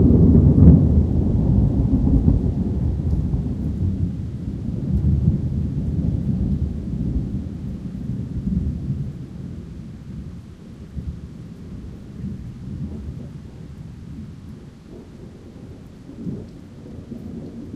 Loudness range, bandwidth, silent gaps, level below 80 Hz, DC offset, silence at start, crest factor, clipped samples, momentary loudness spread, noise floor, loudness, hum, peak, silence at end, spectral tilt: 17 LU; 5.2 kHz; none; -28 dBFS; under 0.1%; 0 s; 20 dB; under 0.1%; 22 LU; -40 dBFS; -21 LUFS; none; 0 dBFS; 0 s; -11 dB/octave